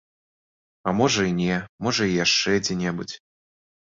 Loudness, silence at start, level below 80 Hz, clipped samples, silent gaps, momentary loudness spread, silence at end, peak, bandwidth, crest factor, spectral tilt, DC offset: -23 LUFS; 0.85 s; -54 dBFS; under 0.1%; 1.69-1.78 s; 12 LU; 0.8 s; -6 dBFS; 7.8 kHz; 18 dB; -4 dB/octave; under 0.1%